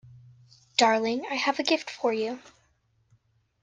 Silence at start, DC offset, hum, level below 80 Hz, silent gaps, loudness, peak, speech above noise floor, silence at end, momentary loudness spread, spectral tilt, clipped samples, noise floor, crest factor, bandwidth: 0.05 s; under 0.1%; none; -74 dBFS; none; -26 LUFS; -4 dBFS; 42 dB; 1.2 s; 9 LU; -2.5 dB/octave; under 0.1%; -69 dBFS; 24 dB; 10 kHz